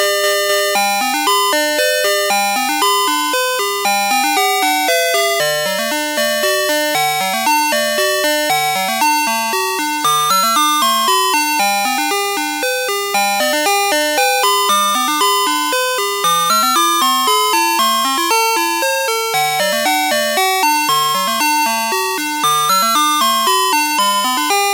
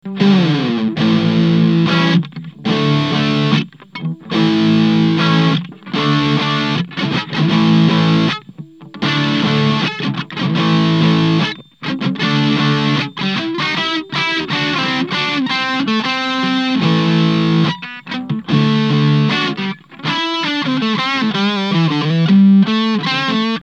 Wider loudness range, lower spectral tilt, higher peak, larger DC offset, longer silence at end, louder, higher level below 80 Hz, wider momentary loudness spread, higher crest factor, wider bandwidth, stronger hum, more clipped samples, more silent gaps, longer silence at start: about the same, 1 LU vs 2 LU; second, -0.5 dB/octave vs -6.5 dB/octave; about the same, 0 dBFS vs -2 dBFS; second, under 0.1% vs 0.1%; about the same, 0 s vs 0 s; about the same, -14 LUFS vs -15 LUFS; second, -78 dBFS vs -52 dBFS; second, 4 LU vs 8 LU; about the same, 14 dB vs 14 dB; first, 17 kHz vs 7.8 kHz; neither; neither; neither; about the same, 0 s vs 0.05 s